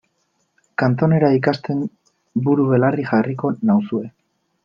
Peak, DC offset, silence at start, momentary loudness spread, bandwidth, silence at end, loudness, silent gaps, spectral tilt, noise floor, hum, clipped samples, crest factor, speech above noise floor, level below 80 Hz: -2 dBFS; under 0.1%; 0.8 s; 11 LU; 7 kHz; 0.55 s; -19 LUFS; none; -9.5 dB/octave; -68 dBFS; none; under 0.1%; 16 dB; 50 dB; -60 dBFS